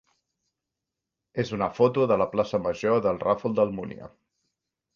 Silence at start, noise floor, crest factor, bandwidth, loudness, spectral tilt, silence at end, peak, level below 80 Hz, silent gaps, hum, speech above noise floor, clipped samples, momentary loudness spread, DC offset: 1.35 s; -86 dBFS; 20 dB; 7.2 kHz; -25 LUFS; -7.5 dB/octave; 0.9 s; -8 dBFS; -60 dBFS; none; none; 61 dB; under 0.1%; 13 LU; under 0.1%